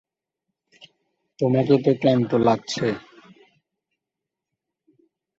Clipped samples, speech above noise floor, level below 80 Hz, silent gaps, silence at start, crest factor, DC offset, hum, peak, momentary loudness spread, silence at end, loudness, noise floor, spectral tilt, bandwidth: under 0.1%; 66 dB; -62 dBFS; none; 1.4 s; 20 dB; under 0.1%; none; -4 dBFS; 8 LU; 2.4 s; -21 LUFS; -86 dBFS; -7 dB/octave; 8 kHz